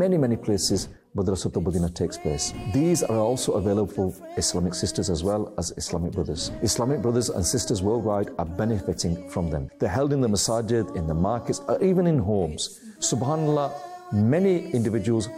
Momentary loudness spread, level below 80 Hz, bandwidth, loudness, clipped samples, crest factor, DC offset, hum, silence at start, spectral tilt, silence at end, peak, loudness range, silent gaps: 7 LU; -46 dBFS; 16 kHz; -25 LUFS; under 0.1%; 12 dB; under 0.1%; none; 0 s; -5.5 dB/octave; 0 s; -12 dBFS; 2 LU; none